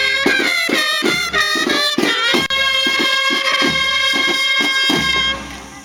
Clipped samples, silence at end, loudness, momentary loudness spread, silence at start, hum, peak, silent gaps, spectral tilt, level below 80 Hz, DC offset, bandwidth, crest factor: under 0.1%; 0 s; -14 LUFS; 2 LU; 0 s; none; -2 dBFS; none; -1.5 dB/octave; -44 dBFS; under 0.1%; 19 kHz; 16 dB